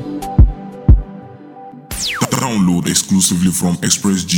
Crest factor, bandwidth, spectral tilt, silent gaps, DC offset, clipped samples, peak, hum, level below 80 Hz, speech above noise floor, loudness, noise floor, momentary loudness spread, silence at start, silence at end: 14 dB; 17.5 kHz; -4 dB/octave; none; under 0.1%; under 0.1%; 0 dBFS; none; -20 dBFS; 21 dB; -15 LUFS; -35 dBFS; 20 LU; 0 s; 0 s